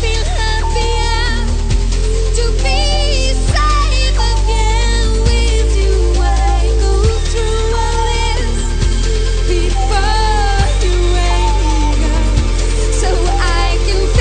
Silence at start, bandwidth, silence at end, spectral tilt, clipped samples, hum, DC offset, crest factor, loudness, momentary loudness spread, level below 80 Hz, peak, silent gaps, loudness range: 0 s; 9.4 kHz; 0 s; -4.5 dB/octave; under 0.1%; none; under 0.1%; 12 dB; -15 LUFS; 3 LU; -12 dBFS; 0 dBFS; none; 2 LU